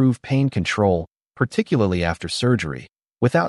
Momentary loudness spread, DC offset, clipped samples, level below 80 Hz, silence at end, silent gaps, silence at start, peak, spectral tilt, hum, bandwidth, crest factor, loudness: 7 LU; under 0.1%; under 0.1%; -46 dBFS; 0 s; none; 0 s; -4 dBFS; -6.5 dB/octave; none; 11.5 kHz; 16 dB; -21 LUFS